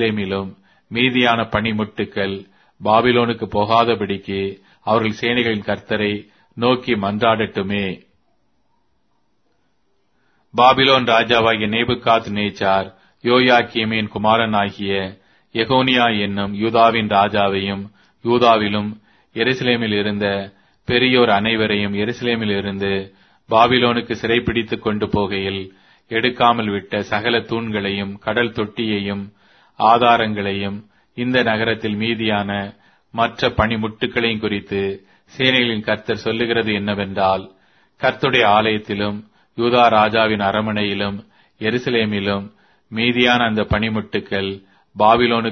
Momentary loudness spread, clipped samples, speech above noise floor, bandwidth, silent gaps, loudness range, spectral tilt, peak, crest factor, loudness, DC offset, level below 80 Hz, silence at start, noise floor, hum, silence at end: 12 LU; under 0.1%; 50 dB; 6.4 kHz; none; 4 LU; -6.5 dB/octave; 0 dBFS; 18 dB; -18 LUFS; under 0.1%; -48 dBFS; 0 s; -67 dBFS; none; 0 s